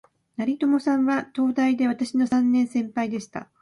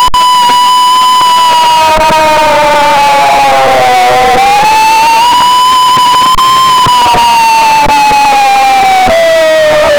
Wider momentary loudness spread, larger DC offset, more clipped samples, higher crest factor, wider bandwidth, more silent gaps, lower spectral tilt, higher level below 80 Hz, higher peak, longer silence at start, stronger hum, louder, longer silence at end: first, 8 LU vs 1 LU; neither; neither; first, 12 dB vs 4 dB; second, 11 kHz vs over 20 kHz; neither; first, -5.5 dB/octave vs -2 dB/octave; second, -68 dBFS vs -30 dBFS; second, -12 dBFS vs 0 dBFS; first, 0.4 s vs 0 s; neither; second, -23 LUFS vs -5 LUFS; first, 0.15 s vs 0 s